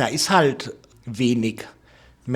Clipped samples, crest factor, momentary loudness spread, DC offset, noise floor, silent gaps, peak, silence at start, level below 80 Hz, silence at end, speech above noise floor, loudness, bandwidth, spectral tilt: under 0.1%; 22 dB; 22 LU; under 0.1%; -52 dBFS; none; -2 dBFS; 0 s; -58 dBFS; 0 s; 31 dB; -21 LUFS; 18 kHz; -4.5 dB/octave